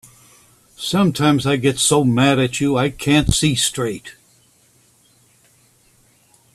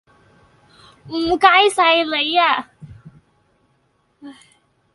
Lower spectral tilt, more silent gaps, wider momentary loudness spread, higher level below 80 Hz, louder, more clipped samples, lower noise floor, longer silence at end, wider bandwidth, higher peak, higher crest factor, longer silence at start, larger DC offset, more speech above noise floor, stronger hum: first, -4.5 dB/octave vs -2.5 dB/octave; neither; second, 9 LU vs 13 LU; first, -40 dBFS vs -54 dBFS; about the same, -17 LUFS vs -15 LUFS; neither; second, -56 dBFS vs -63 dBFS; first, 2.45 s vs 0.6 s; first, 14.5 kHz vs 11.5 kHz; about the same, 0 dBFS vs 0 dBFS; about the same, 20 dB vs 20 dB; second, 0.8 s vs 1.05 s; neither; second, 39 dB vs 48 dB; neither